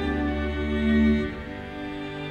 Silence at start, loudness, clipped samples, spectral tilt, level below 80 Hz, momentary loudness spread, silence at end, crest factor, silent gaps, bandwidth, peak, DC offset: 0 s; -26 LUFS; under 0.1%; -8 dB/octave; -34 dBFS; 13 LU; 0 s; 14 dB; none; 7.2 kHz; -12 dBFS; under 0.1%